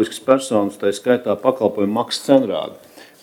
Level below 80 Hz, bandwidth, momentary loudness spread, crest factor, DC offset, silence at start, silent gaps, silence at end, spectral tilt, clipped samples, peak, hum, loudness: -66 dBFS; 16.5 kHz; 6 LU; 18 dB; under 0.1%; 0 s; none; 0.2 s; -5 dB/octave; under 0.1%; 0 dBFS; none; -18 LUFS